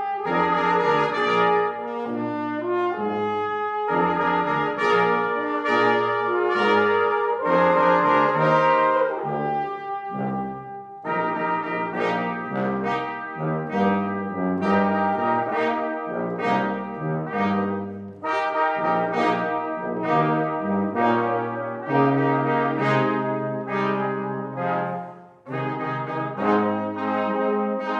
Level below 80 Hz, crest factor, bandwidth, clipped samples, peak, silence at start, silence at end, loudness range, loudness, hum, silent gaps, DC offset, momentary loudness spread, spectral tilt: -66 dBFS; 16 dB; 8.8 kHz; under 0.1%; -6 dBFS; 0 s; 0 s; 6 LU; -23 LUFS; none; none; under 0.1%; 9 LU; -7.5 dB/octave